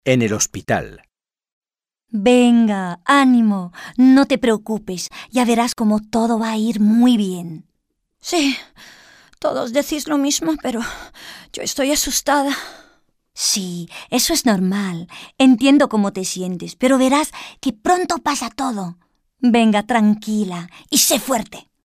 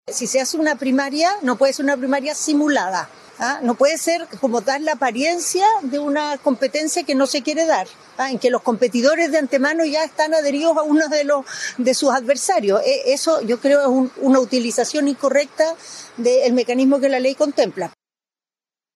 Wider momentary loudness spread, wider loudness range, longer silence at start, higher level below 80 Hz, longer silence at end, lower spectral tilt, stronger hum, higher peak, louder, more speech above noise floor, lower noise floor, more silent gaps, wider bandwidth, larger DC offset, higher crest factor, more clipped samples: first, 15 LU vs 5 LU; first, 6 LU vs 2 LU; about the same, 0.05 s vs 0.05 s; first, -50 dBFS vs -76 dBFS; second, 0.25 s vs 1.05 s; first, -4 dB/octave vs -2.5 dB/octave; neither; about the same, -2 dBFS vs -4 dBFS; about the same, -17 LUFS vs -18 LUFS; second, 58 dB vs over 72 dB; second, -75 dBFS vs under -90 dBFS; first, 1.53-1.61 s vs none; first, 16 kHz vs 13.5 kHz; neither; about the same, 16 dB vs 14 dB; neither